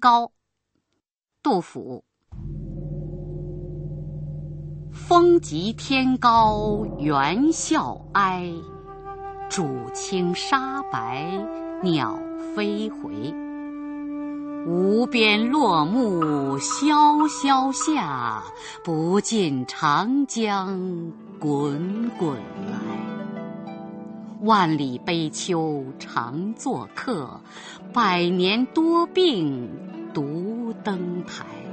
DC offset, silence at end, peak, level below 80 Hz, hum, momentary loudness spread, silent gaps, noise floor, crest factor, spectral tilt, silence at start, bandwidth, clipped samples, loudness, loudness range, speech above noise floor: under 0.1%; 0 s; -4 dBFS; -48 dBFS; none; 17 LU; none; -78 dBFS; 20 dB; -5 dB/octave; 0 s; 8.8 kHz; under 0.1%; -23 LUFS; 8 LU; 56 dB